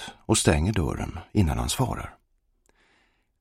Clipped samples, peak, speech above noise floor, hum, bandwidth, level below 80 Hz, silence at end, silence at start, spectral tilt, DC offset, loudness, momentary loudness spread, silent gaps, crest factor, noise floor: under 0.1%; -6 dBFS; 44 dB; none; 16 kHz; -36 dBFS; 1.3 s; 0 s; -5 dB/octave; under 0.1%; -25 LUFS; 13 LU; none; 20 dB; -68 dBFS